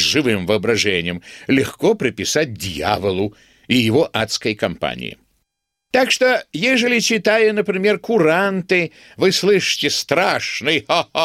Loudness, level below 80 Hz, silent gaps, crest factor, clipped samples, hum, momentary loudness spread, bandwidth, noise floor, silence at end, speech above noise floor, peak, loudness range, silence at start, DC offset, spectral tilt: -17 LUFS; -52 dBFS; none; 18 dB; under 0.1%; none; 8 LU; 16 kHz; -75 dBFS; 0 s; 57 dB; 0 dBFS; 4 LU; 0 s; under 0.1%; -3.5 dB/octave